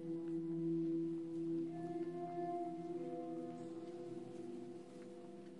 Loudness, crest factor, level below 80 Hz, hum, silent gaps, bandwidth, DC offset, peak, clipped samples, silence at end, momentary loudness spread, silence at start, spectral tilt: -45 LUFS; 12 dB; -90 dBFS; none; none; 10.5 kHz; under 0.1%; -32 dBFS; under 0.1%; 0 s; 12 LU; 0 s; -8.5 dB/octave